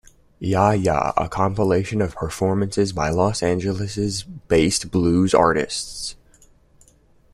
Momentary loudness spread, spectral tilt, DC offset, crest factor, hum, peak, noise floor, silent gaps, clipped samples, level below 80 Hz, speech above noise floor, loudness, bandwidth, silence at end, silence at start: 9 LU; -5.5 dB/octave; under 0.1%; 20 dB; none; -2 dBFS; -55 dBFS; none; under 0.1%; -44 dBFS; 35 dB; -21 LUFS; 13.5 kHz; 1.2 s; 0.4 s